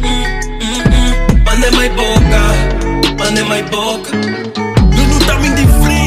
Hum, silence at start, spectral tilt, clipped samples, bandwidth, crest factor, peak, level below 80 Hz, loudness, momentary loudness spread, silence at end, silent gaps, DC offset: none; 0 s; -5 dB/octave; under 0.1%; 15.5 kHz; 10 dB; 0 dBFS; -14 dBFS; -12 LUFS; 7 LU; 0 s; none; under 0.1%